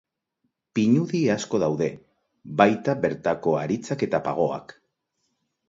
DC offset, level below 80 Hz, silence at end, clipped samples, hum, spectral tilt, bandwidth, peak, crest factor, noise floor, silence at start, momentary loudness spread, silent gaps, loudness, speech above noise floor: under 0.1%; -62 dBFS; 0.95 s; under 0.1%; none; -6.5 dB/octave; 7.8 kHz; -2 dBFS; 24 dB; -76 dBFS; 0.75 s; 8 LU; none; -24 LUFS; 53 dB